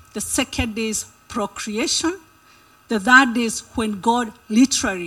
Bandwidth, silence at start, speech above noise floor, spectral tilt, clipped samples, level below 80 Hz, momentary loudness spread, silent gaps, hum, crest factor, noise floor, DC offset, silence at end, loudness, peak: 16 kHz; 0.15 s; 32 dB; -2.5 dB/octave; under 0.1%; -44 dBFS; 14 LU; none; none; 20 dB; -52 dBFS; under 0.1%; 0 s; -20 LUFS; 0 dBFS